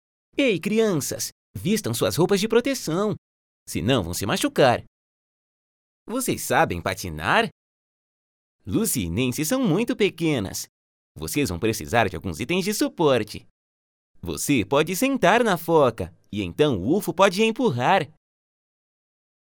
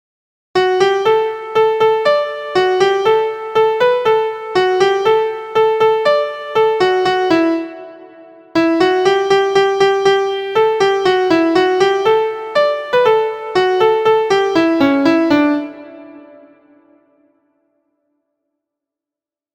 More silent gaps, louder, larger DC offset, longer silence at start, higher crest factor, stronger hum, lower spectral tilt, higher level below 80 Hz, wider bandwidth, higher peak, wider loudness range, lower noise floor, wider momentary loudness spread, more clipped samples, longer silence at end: first, 1.32-1.54 s, 3.18-3.66 s, 4.87-6.06 s, 7.52-8.59 s, 10.69-11.15 s, 13.51-14.15 s vs none; second, -23 LUFS vs -14 LUFS; neither; second, 0.35 s vs 0.55 s; first, 20 dB vs 14 dB; neither; about the same, -4.5 dB/octave vs -4.5 dB/octave; about the same, -54 dBFS vs -56 dBFS; first, 19 kHz vs 9.4 kHz; about the same, -2 dBFS vs 0 dBFS; about the same, 4 LU vs 2 LU; about the same, under -90 dBFS vs -88 dBFS; first, 12 LU vs 5 LU; neither; second, 1.4 s vs 3.35 s